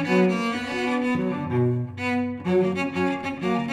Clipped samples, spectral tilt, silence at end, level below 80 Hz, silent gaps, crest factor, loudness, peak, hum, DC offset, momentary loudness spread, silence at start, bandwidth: under 0.1%; -7 dB/octave; 0 s; -60 dBFS; none; 14 dB; -24 LUFS; -10 dBFS; none; under 0.1%; 4 LU; 0 s; 12 kHz